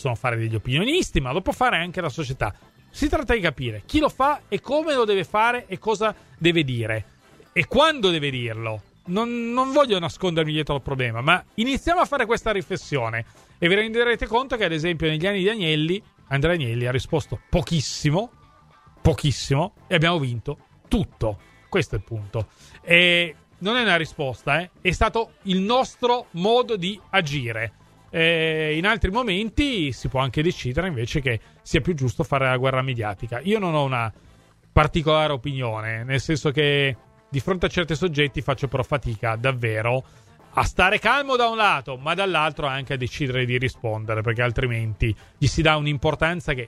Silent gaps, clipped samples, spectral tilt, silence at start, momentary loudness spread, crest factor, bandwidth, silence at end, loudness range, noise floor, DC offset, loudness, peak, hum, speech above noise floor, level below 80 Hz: none; under 0.1%; -5.5 dB/octave; 0 s; 9 LU; 22 dB; 14 kHz; 0 s; 3 LU; -53 dBFS; under 0.1%; -23 LUFS; 0 dBFS; none; 31 dB; -38 dBFS